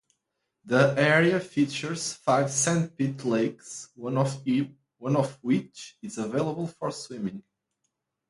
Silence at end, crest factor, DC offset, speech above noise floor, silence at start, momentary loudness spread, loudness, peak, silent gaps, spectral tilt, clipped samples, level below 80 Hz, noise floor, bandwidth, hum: 0.9 s; 20 dB; under 0.1%; 54 dB; 0.65 s; 15 LU; -27 LUFS; -6 dBFS; none; -5 dB/octave; under 0.1%; -68 dBFS; -81 dBFS; 11.5 kHz; none